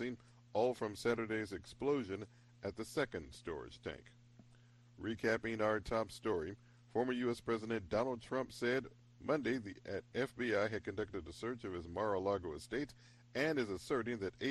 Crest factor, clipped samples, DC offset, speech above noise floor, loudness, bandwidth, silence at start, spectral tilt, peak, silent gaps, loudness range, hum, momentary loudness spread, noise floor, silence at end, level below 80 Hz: 18 dB; under 0.1%; under 0.1%; 25 dB; -40 LUFS; 12.5 kHz; 0 s; -5.5 dB/octave; -22 dBFS; none; 4 LU; none; 11 LU; -64 dBFS; 0 s; -64 dBFS